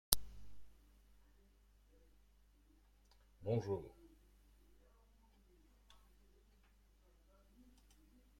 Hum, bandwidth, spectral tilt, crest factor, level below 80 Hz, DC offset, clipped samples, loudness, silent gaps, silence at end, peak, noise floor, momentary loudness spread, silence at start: 50 Hz at -70 dBFS; 16 kHz; -3.5 dB/octave; 46 dB; -62 dBFS; under 0.1%; under 0.1%; -41 LUFS; none; 0.8 s; -2 dBFS; -70 dBFS; 24 LU; 0.1 s